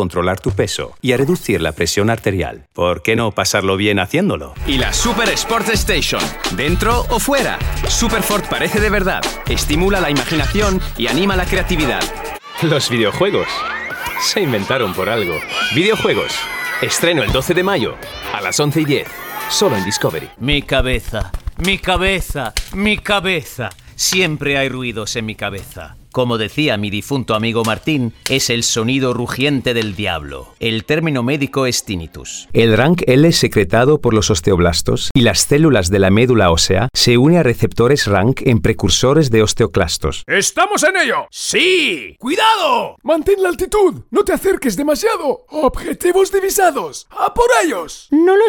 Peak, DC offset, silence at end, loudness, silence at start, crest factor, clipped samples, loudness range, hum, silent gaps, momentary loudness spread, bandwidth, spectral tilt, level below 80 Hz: 0 dBFS; under 0.1%; 0 s; -15 LUFS; 0 s; 14 dB; under 0.1%; 5 LU; none; 35.11-35.15 s; 9 LU; 18 kHz; -4 dB/octave; -30 dBFS